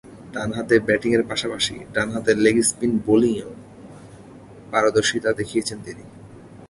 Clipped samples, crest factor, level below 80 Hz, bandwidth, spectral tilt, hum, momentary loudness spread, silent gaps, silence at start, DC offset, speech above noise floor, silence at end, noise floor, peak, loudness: under 0.1%; 18 dB; -52 dBFS; 11.5 kHz; -4 dB/octave; none; 16 LU; none; 0.05 s; under 0.1%; 22 dB; 0.05 s; -43 dBFS; -4 dBFS; -21 LUFS